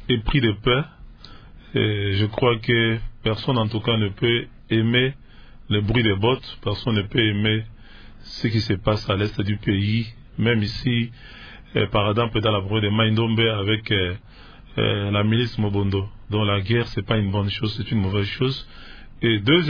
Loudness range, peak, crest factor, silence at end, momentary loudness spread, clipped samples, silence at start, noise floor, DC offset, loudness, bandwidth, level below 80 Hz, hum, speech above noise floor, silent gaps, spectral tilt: 2 LU; -4 dBFS; 18 dB; 0 s; 8 LU; under 0.1%; 0 s; -43 dBFS; under 0.1%; -22 LUFS; 5.4 kHz; -40 dBFS; none; 21 dB; none; -7.5 dB/octave